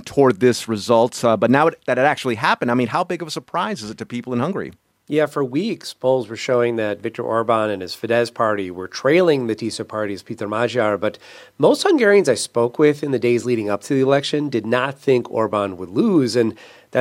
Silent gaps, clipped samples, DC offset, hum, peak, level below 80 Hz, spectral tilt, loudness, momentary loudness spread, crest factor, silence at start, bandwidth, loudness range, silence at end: none; under 0.1%; under 0.1%; none; 0 dBFS; -64 dBFS; -5.5 dB/octave; -19 LUFS; 10 LU; 18 dB; 0.05 s; 16 kHz; 5 LU; 0 s